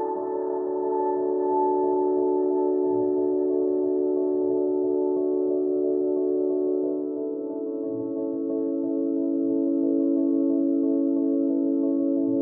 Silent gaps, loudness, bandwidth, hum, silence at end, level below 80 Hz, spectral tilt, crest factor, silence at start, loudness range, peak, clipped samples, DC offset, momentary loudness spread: none; -25 LUFS; 1.9 kHz; none; 0 s; -80 dBFS; -6.5 dB/octave; 12 dB; 0 s; 3 LU; -12 dBFS; under 0.1%; under 0.1%; 5 LU